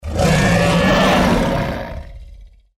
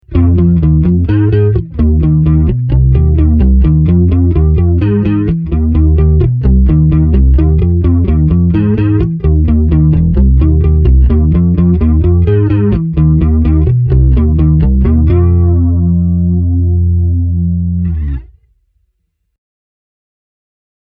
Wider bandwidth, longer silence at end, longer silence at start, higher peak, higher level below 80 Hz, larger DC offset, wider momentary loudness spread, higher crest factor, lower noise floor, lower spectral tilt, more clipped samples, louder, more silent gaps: first, 16 kHz vs 3.5 kHz; second, 0.3 s vs 2.6 s; about the same, 0.05 s vs 0.1 s; second, -4 dBFS vs 0 dBFS; second, -28 dBFS vs -14 dBFS; neither; first, 15 LU vs 3 LU; about the same, 12 dB vs 8 dB; second, -40 dBFS vs -64 dBFS; second, -5.5 dB/octave vs -13 dB/octave; neither; second, -15 LUFS vs -10 LUFS; neither